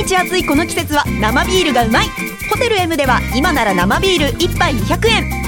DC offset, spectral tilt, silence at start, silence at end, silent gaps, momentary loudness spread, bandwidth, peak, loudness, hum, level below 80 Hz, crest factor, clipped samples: under 0.1%; -4 dB/octave; 0 s; 0 s; none; 3 LU; 17.5 kHz; 0 dBFS; -14 LUFS; none; -26 dBFS; 14 dB; under 0.1%